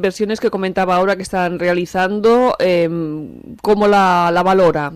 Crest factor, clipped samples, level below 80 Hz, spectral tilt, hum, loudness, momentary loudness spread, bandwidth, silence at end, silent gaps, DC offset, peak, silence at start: 12 dB; under 0.1%; -46 dBFS; -6 dB/octave; none; -15 LUFS; 9 LU; 14 kHz; 0 s; none; under 0.1%; -2 dBFS; 0 s